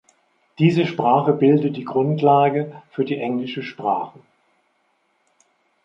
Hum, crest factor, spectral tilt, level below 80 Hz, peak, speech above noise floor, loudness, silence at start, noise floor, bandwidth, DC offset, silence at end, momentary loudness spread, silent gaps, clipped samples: none; 18 dB; -8.5 dB/octave; -68 dBFS; -4 dBFS; 47 dB; -20 LUFS; 0.6 s; -66 dBFS; 7.4 kHz; under 0.1%; 1.75 s; 10 LU; none; under 0.1%